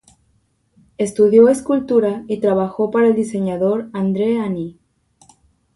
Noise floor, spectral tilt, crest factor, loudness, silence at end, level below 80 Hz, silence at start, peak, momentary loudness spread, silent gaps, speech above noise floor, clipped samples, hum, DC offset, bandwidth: -62 dBFS; -7 dB/octave; 16 dB; -17 LUFS; 1.05 s; -56 dBFS; 1 s; -2 dBFS; 11 LU; none; 46 dB; under 0.1%; none; under 0.1%; 11.5 kHz